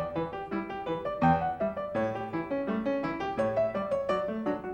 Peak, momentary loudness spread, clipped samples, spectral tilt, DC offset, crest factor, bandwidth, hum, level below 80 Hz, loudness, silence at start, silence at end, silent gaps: -12 dBFS; 8 LU; under 0.1%; -8 dB/octave; under 0.1%; 18 dB; 9 kHz; none; -56 dBFS; -31 LUFS; 0 s; 0 s; none